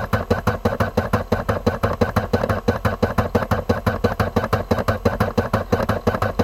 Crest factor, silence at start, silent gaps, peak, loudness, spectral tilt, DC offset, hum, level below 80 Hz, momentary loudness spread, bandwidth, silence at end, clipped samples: 18 dB; 0 s; none; -2 dBFS; -21 LUFS; -7 dB/octave; under 0.1%; none; -34 dBFS; 2 LU; 16 kHz; 0 s; under 0.1%